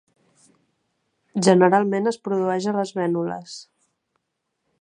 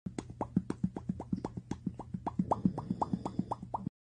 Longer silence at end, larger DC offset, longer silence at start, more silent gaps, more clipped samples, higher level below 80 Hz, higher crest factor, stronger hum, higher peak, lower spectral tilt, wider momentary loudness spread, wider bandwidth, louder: first, 1.2 s vs 0.2 s; neither; first, 1.35 s vs 0.05 s; neither; neither; second, -72 dBFS vs -56 dBFS; about the same, 22 dB vs 22 dB; neither; first, -2 dBFS vs -16 dBFS; second, -6 dB/octave vs -8.5 dB/octave; first, 17 LU vs 8 LU; about the same, 11 kHz vs 10 kHz; first, -21 LUFS vs -38 LUFS